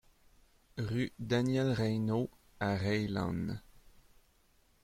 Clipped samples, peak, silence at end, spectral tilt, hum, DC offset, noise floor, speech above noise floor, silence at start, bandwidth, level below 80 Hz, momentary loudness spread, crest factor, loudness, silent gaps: under 0.1%; -18 dBFS; 1.25 s; -7 dB/octave; none; under 0.1%; -69 dBFS; 36 dB; 0.75 s; 15.5 kHz; -60 dBFS; 10 LU; 18 dB; -34 LUFS; none